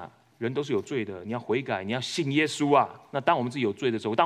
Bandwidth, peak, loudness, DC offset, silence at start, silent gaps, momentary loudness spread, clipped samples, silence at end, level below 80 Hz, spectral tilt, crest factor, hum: 13 kHz; -6 dBFS; -27 LUFS; under 0.1%; 0 s; none; 10 LU; under 0.1%; 0 s; -78 dBFS; -5 dB/octave; 20 dB; none